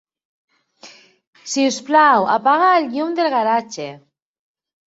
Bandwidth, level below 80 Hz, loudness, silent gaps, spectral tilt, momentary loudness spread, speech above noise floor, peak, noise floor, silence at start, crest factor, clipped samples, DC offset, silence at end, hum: 8 kHz; -72 dBFS; -16 LUFS; 1.27-1.33 s; -3 dB/octave; 17 LU; 29 dB; -2 dBFS; -46 dBFS; 0.85 s; 16 dB; under 0.1%; under 0.1%; 0.9 s; none